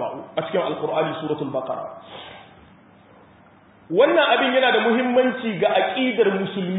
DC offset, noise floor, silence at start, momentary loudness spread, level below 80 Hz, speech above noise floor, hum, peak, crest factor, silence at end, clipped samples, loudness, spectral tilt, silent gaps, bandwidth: under 0.1%; -51 dBFS; 0 s; 14 LU; -66 dBFS; 31 dB; none; -4 dBFS; 18 dB; 0 s; under 0.1%; -20 LUFS; -10 dB/octave; none; 4 kHz